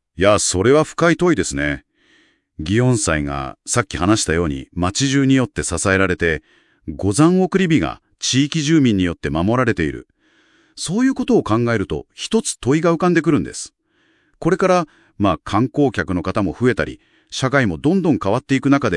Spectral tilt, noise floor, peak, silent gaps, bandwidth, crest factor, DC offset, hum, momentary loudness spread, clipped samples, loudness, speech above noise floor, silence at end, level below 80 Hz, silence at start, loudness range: -5 dB/octave; -61 dBFS; 0 dBFS; none; 12 kHz; 18 dB; under 0.1%; none; 10 LU; under 0.1%; -18 LUFS; 44 dB; 0 s; -42 dBFS; 0.2 s; 3 LU